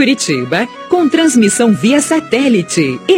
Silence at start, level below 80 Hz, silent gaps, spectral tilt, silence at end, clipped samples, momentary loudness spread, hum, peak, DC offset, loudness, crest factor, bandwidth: 0 s; -56 dBFS; none; -4 dB/octave; 0 s; under 0.1%; 5 LU; none; 0 dBFS; under 0.1%; -12 LUFS; 12 dB; 16.5 kHz